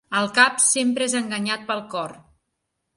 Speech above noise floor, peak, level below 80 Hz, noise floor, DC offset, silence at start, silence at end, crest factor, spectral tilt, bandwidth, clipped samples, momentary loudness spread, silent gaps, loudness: 56 dB; 0 dBFS; -68 dBFS; -78 dBFS; under 0.1%; 0.1 s; 0.8 s; 22 dB; -1.5 dB/octave; 11.5 kHz; under 0.1%; 15 LU; none; -20 LUFS